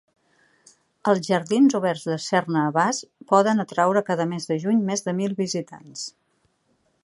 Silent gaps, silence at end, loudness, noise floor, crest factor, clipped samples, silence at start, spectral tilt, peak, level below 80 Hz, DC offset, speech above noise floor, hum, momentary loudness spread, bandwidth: none; 0.95 s; -22 LUFS; -68 dBFS; 20 dB; under 0.1%; 1.05 s; -5 dB/octave; -4 dBFS; -72 dBFS; under 0.1%; 46 dB; none; 12 LU; 11.5 kHz